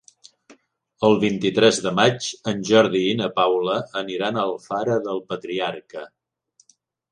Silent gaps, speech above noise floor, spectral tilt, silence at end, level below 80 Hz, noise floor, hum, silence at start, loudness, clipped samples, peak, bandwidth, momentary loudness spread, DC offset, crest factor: none; 42 dB; -4.5 dB/octave; 1.05 s; -64 dBFS; -62 dBFS; none; 1 s; -21 LUFS; under 0.1%; -2 dBFS; 10 kHz; 11 LU; under 0.1%; 20 dB